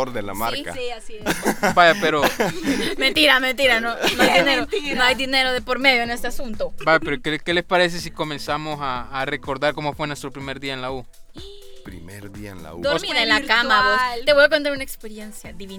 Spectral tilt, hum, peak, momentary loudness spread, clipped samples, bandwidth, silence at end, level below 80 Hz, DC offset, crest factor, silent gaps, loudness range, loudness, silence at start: -3 dB/octave; none; 0 dBFS; 18 LU; under 0.1%; over 20 kHz; 0 s; -40 dBFS; under 0.1%; 20 dB; none; 10 LU; -19 LUFS; 0 s